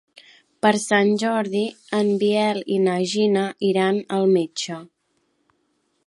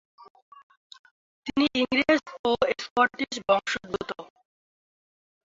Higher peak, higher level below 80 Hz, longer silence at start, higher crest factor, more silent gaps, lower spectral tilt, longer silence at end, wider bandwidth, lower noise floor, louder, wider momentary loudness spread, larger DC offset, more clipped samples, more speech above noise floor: first, -4 dBFS vs -8 dBFS; second, -72 dBFS vs -60 dBFS; first, 0.65 s vs 0.2 s; about the same, 18 dB vs 20 dB; second, none vs 0.30-0.35 s, 0.42-0.52 s, 0.63-0.70 s, 0.77-0.90 s, 0.99-1.04 s, 1.11-1.42 s, 2.39-2.44 s, 2.91-2.96 s; first, -5 dB/octave vs -3.5 dB/octave; second, 1.2 s vs 1.35 s; first, 11.5 kHz vs 7.8 kHz; second, -69 dBFS vs under -90 dBFS; first, -21 LUFS vs -26 LUFS; second, 7 LU vs 11 LU; neither; neither; second, 49 dB vs over 64 dB